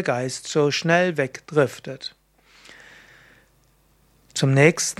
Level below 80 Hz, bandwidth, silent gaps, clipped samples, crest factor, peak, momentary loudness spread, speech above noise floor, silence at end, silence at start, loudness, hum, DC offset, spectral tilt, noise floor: -62 dBFS; 14.5 kHz; none; under 0.1%; 22 dB; 0 dBFS; 17 LU; 39 dB; 0.05 s; 0 s; -21 LUFS; none; under 0.1%; -4.5 dB/octave; -60 dBFS